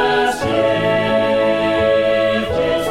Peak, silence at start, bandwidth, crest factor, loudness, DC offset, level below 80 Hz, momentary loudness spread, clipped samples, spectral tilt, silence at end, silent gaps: -4 dBFS; 0 s; 15 kHz; 12 dB; -16 LUFS; under 0.1%; -40 dBFS; 3 LU; under 0.1%; -5 dB/octave; 0 s; none